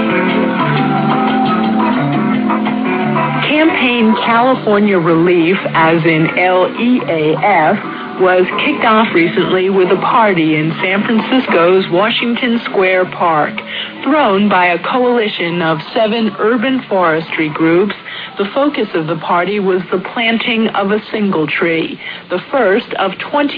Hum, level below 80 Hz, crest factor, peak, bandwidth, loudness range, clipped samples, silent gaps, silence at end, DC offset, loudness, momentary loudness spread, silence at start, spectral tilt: none; -56 dBFS; 12 dB; 0 dBFS; 5.2 kHz; 3 LU; under 0.1%; none; 0 s; under 0.1%; -13 LUFS; 6 LU; 0 s; -9 dB/octave